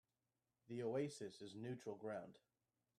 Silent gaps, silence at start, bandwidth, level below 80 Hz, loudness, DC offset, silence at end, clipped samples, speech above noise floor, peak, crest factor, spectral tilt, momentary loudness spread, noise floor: none; 0.7 s; 13 kHz; -90 dBFS; -49 LUFS; under 0.1%; 0.6 s; under 0.1%; over 41 dB; -32 dBFS; 20 dB; -6 dB/octave; 9 LU; under -90 dBFS